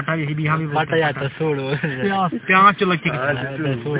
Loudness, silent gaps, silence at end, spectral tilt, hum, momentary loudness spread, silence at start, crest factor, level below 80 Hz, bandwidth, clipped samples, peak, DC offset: -19 LUFS; none; 0 s; -10 dB/octave; none; 10 LU; 0 s; 18 dB; -54 dBFS; 4 kHz; under 0.1%; -2 dBFS; under 0.1%